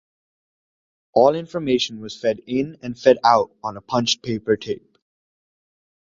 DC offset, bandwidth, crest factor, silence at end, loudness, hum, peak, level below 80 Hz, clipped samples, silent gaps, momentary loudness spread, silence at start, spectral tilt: under 0.1%; 7.6 kHz; 20 dB; 1.35 s; -21 LUFS; none; -2 dBFS; -60 dBFS; under 0.1%; none; 12 LU; 1.15 s; -4.5 dB/octave